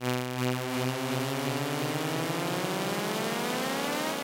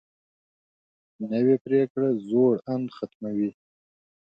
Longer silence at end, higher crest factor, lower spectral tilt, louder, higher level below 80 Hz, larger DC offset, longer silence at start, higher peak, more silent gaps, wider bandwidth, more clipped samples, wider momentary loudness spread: second, 0 s vs 0.8 s; about the same, 14 dB vs 16 dB; second, -4.5 dB/octave vs -10 dB/octave; second, -30 LUFS vs -25 LUFS; about the same, -70 dBFS vs -74 dBFS; neither; second, 0 s vs 1.2 s; second, -16 dBFS vs -10 dBFS; second, none vs 1.61-1.65 s, 1.90-1.95 s, 3.15-3.20 s; first, 17 kHz vs 5.2 kHz; neither; second, 1 LU vs 11 LU